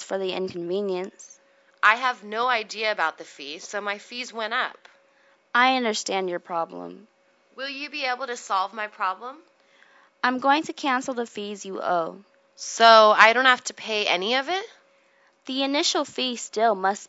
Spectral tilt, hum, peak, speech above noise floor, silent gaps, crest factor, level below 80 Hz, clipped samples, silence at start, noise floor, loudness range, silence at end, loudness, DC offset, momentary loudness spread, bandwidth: -2 dB/octave; none; 0 dBFS; 38 dB; none; 24 dB; -84 dBFS; under 0.1%; 0 s; -61 dBFS; 10 LU; 0.05 s; -23 LUFS; under 0.1%; 15 LU; 8 kHz